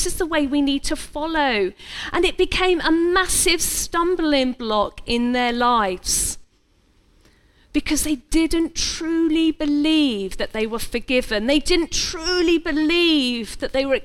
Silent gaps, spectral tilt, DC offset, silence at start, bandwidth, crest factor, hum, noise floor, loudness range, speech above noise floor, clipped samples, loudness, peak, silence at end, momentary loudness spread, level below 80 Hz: none; -2.5 dB/octave; under 0.1%; 0 s; 17.5 kHz; 16 dB; none; -59 dBFS; 4 LU; 39 dB; under 0.1%; -20 LUFS; -4 dBFS; 0 s; 8 LU; -36 dBFS